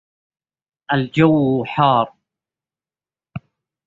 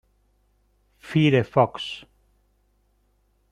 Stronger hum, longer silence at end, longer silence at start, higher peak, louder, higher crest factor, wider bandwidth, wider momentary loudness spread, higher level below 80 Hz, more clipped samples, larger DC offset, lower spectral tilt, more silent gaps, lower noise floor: second, none vs 50 Hz at -60 dBFS; second, 0.5 s vs 1.5 s; second, 0.9 s vs 1.05 s; about the same, -2 dBFS vs -4 dBFS; first, -17 LUFS vs -22 LUFS; about the same, 18 dB vs 22 dB; second, 7.6 kHz vs 10.5 kHz; first, 22 LU vs 14 LU; about the same, -56 dBFS vs -60 dBFS; neither; neither; about the same, -8.5 dB/octave vs -7.5 dB/octave; neither; first, under -90 dBFS vs -66 dBFS